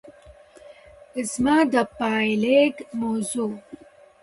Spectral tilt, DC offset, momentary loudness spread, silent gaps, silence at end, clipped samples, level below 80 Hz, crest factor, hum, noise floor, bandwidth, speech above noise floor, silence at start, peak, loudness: -4.5 dB/octave; under 0.1%; 12 LU; none; 0.5 s; under 0.1%; -58 dBFS; 18 dB; none; -49 dBFS; 11.5 kHz; 27 dB; 0.05 s; -6 dBFS; -22 LUFS